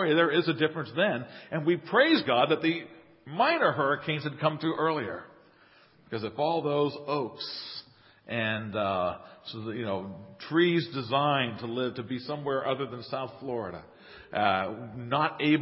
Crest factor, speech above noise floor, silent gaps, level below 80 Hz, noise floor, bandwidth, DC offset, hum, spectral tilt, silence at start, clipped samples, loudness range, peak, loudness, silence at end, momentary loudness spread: 20 dB; 31 dB; none; -66 dBFS; -59 dBFS; 5.8 kHz; under 0.1%; none; -9.5 dB/octave; 0 s; under 0.1%; 6 LU; -10 dBFS; -29 LUFS; 0 s; 14 LU